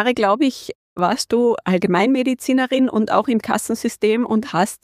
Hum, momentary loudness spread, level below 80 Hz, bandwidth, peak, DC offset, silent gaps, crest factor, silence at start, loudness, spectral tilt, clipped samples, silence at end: none; 5 LU; -60 dBFS; 15.5 kHz; -2 dBFS; under 0.1%; 0.75-0.96 s; 16 dB; 0 s; -18 LUFS; -5 dB/octave; under 0.1%; 0.1 s